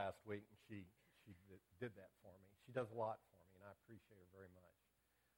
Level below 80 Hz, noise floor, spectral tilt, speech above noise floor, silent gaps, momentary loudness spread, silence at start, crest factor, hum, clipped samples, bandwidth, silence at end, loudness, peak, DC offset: -86 dBFS; -83 dBFS; -7 dB/octave; 31 dB; none; 19 LU; 0 s; 24 dB; none; under 0.1%; 17.5 kHz; 0.7 s; -52 LUFS; -32 dBFS; under 0.1%